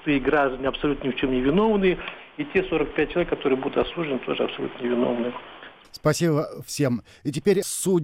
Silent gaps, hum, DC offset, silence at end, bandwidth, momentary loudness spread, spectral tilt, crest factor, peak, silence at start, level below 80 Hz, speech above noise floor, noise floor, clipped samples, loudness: none; none; under 0.1%; 0 s; 16 kHz; 10 LU; -5.5 dB/octave; 16 dB; -8 dBFS; 0 s; -44 dBFS; 21 dB; -44 dBFS; under 0.1%; -24 LUFS